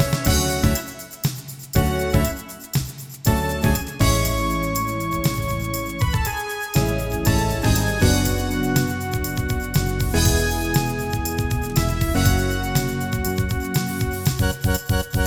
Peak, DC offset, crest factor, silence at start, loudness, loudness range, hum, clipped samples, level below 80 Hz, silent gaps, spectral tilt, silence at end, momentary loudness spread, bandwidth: -4 dBFS; under 0.1%; 16 dB; 0 s; -22 LUFS; 2 LU; none; under 0.1%; -28 dBFS; none; -5 dB/octave; 0 s; 7 LU; over 20 kHz